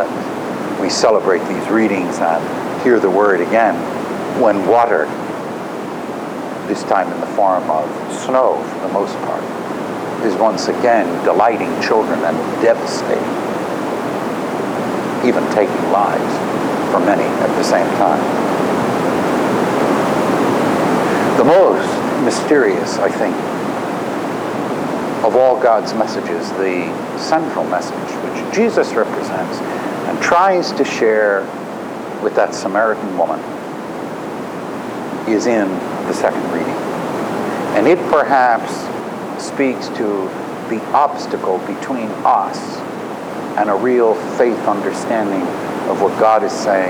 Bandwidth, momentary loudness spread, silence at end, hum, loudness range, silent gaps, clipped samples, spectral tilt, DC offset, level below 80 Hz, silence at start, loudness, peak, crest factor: over 20 kHz; 11 LU; 0 s; none; 5 LU; none; under 0.1%; -5 dB/octave; under 0.1%; -58 dBFS; 0 s; -16 LUFS; -2 dBFS; 14 dB